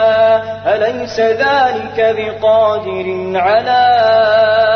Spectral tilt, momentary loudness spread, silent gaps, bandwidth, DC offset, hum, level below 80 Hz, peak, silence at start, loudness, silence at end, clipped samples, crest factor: -5 dB/octave; 7 LU; none; 6.6 kHz; under 0.1%; 50 Hz at -40 dBFS; -48 dBFS; -2 dBFS; 0 s; -13 LUFS; 0 s; under 0.1%; 10 dB